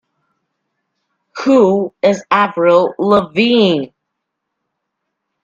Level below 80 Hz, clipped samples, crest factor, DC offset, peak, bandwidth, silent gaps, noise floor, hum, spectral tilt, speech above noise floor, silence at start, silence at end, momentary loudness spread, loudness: -58 dBFS; under 0.1%; 16 dB; under 0.1%; 0 dBFS; 7.6 kHz; none; -75 dBFS; none; -6 dB/octave; 63 dB; 1.35 s; 1.55 s; 9 LU; -13 LUFS